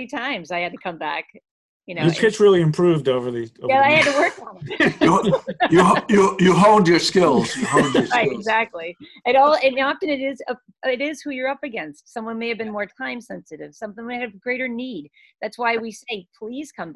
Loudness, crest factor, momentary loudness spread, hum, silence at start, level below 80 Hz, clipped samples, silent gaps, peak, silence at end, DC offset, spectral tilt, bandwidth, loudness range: -19 LUFS; 18 dB; 18 LU; none; 0 s; -56 dBFS; under 0.1%; 1.51-1.80 s; -2 dBFS; 0 s; under 0.1%; -5.5 dB/octave; 12 kHz; 12 LU